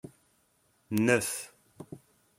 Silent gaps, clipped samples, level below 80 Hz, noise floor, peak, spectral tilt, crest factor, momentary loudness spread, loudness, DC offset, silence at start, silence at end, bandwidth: none; under 0.1%; -70 dBFS; -70 dBFS; -8 dBFS; -4.5 dB/octave; 24 dB; 25 LU; -29 LUFS; under 0.1%; 0.9 s; 0.4 s; 16.5 kHz